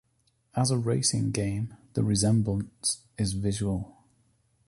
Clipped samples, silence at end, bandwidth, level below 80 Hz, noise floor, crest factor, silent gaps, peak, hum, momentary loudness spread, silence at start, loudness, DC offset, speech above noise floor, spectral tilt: under 0.1%; 0.8 s; 11.5 kHz; -50 dBFS; -70 dBFS; 16 dB; none; -12 dBFS; none; 9 LU; 0.55 s; -28 LUFS; under 0.1%; 44 dB; -5 dB/octave